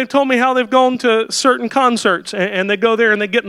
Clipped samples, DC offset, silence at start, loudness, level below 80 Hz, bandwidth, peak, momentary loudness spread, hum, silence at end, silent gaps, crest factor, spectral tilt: under 0.1%; under 0.1%; 0 s; -14 LUFS; -64 dBFS; 13 kHz; 0 dBFS; 4 LU; none; 0 s; none; 14 dB; -3.5 dB/octave